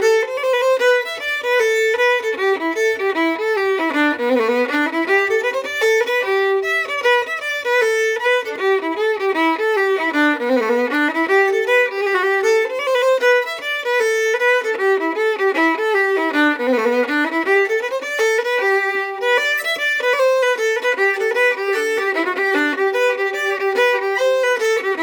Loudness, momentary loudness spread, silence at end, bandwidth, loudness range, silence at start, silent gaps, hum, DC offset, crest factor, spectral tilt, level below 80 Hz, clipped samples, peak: -17 LUFS; 3 LU; 0 s; over 20 kHz; 1 LU; 0 s; none; none; under 0.1%; 14 dB; -1.5 dB/octave; -74 dBFS; under 0.1%; -4 dBFS